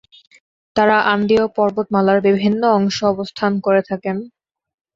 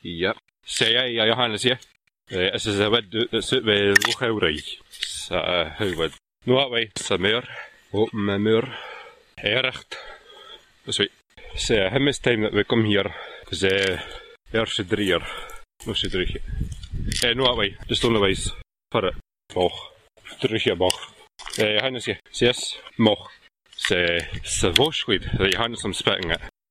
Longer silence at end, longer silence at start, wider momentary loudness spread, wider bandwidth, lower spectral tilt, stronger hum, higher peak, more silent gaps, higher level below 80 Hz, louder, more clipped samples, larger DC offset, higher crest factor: first, 0.7 s vs 0.2 s; first, 0.75 s vs 0.05 s; second, 9 LU vs 16 LU; second, 7.6 kHz vs 15.5 kHz; first, -6 dB/octave vs -3.5 dB/octave; neither; about the same, -2 dBFS vs -2 dBFS; neither; second, -54 dBFS vs -42 dBFS; first, -17 LUFS vs -23 LUFS; neither; neither; second, 16 dB vs 22 dB